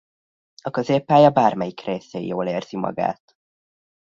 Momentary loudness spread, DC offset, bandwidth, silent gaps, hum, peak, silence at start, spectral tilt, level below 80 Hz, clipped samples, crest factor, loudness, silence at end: 14 LU; under 0.1%; 7.4 kHz; none; none; -2 dBFS; 0.65 s; -7 dB/octave; -64 dBFS; under 0.1%; 20 dB; -21 LUFS; 1 s